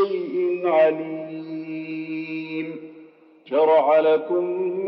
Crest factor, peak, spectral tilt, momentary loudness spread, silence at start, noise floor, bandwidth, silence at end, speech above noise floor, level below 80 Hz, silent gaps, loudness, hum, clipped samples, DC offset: 14 dB; -8 dBFS; -8.5 dB/octave; 15 LU; 0 s; -49 dBFS; 5.6 kHz; 0 s; 29 dB; -88 dBFS; none; -22 LUFS; none; under 0.1%; under 0.1%